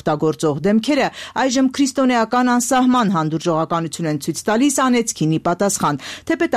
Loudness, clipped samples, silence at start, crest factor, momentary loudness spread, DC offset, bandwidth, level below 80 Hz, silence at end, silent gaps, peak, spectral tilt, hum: -18 LUFS; under 0.1%; 0.05 s; 10 dB; 6 LU; under 0.1%; 15 kHz; -54 dBFS; 0 s; none; -6 dBFS; -4.5 dB/octave; none